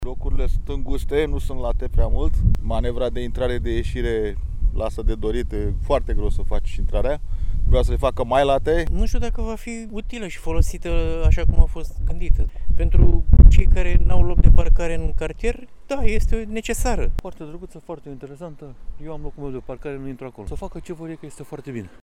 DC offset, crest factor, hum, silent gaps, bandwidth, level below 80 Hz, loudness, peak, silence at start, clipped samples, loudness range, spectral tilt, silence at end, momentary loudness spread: under 0.1%; 16 dB; none; none; 10.5 kHz; -20 dBFS; -23 LUFS; 0 dBFS; 0 s; under 0.1%; 14 LU; -7 dB/octave; 0.15 s; 16 LU